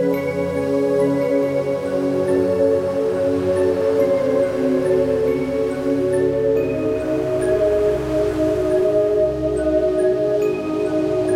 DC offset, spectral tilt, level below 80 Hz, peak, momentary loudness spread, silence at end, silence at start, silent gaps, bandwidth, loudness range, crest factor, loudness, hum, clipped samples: under 0.1%; -7.5 dB/octave; -42 dBFS; -6 dBFS; 4 LU; 0 s; 0 s; none; 15.5 kHz; 1 LU; 12 dB; -19 LUFS; none; under 0.1%